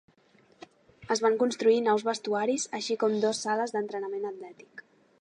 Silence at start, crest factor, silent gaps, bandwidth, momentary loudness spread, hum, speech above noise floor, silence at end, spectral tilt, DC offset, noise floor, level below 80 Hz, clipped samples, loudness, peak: 1 s; 16 dB; none; 11 kHz; 15 LU; none; 35 dB; 0.4 s; -3.5 dB/octave; under 0.1%; -63 dBFS; -78 dBFS; under 0.1%; -28 LUFS; -12 dBFS